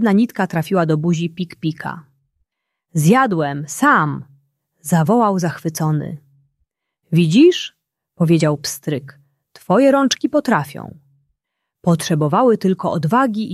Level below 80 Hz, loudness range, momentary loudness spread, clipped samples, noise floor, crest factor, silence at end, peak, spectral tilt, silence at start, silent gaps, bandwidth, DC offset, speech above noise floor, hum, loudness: -60 dBFS; 2 LU; 14 LU; under 0.1%; -78 dBFS; 16 dB; 0 s; -2 dBFS; -6 dB/octave; 0 s; none; 14 kHz; under 0.1%; 62 dB; none; -17 LUFS